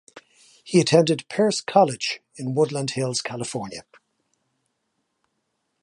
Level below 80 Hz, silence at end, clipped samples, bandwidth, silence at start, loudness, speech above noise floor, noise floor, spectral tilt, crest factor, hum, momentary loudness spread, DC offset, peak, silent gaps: -68 dBFS; 2 s; under 0.1%; 11.5 kHz; 0.15 s; -22 LUFS; 53 dB; -75 dBFS; -4.5 dB/octave; 22 dB; none; 13 LU; under 0.1%; -2 dBFS; none